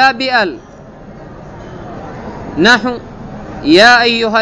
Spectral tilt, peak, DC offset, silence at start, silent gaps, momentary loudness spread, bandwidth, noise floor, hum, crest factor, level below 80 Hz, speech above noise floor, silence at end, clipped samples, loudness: -4 dB/octave; 0 dBFS; under 0.1%; 0 s; none; 25 LU; 11 kHz; -33 dBFS; none; 14 dB; -40 dBFS; 23 dB; 0 s; 0.5%; -10 LUFS